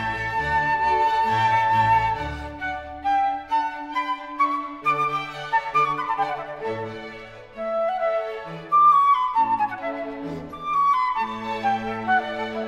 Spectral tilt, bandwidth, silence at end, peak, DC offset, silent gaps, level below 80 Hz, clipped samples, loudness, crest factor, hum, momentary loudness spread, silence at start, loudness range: -5.5 dB/octave; 12 kHz; 0 s; -8 dBFS; under 0.1%; none; -48 dBFS; under 0.1%; -23 LUFS; 14 dB; none; 13 LU; 0 s; 5 LU